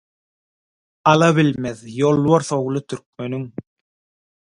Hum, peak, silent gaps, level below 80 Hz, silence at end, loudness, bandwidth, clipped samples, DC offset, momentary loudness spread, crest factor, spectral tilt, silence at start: none; 0 dBFS; 3.06-3.13 s; -58 dBFS; 0.9 s; -18 LUFS; 11 kHz; under 0.1%; under 0.1%; 16 LU; 20 dB; -6 dB/octave; 1.05 s